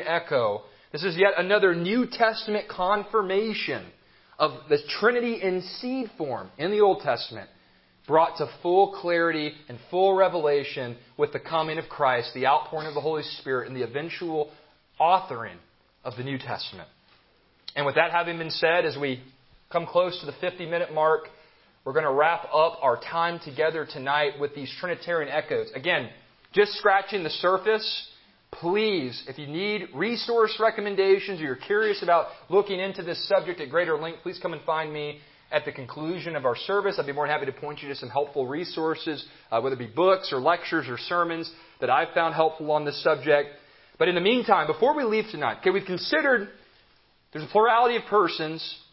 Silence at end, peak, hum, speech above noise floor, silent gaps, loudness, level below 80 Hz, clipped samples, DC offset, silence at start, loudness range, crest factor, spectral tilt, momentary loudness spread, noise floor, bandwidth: 0.15 s; -4 dBFS; none; 37 dB; none; -25 LUFS; -68 dBFS; under 0.1%; under 0.1%; 0 s; 5 LU; 22 dB; -9 dB/octave; 12 LU; -62 dBFS; 5.8 kHz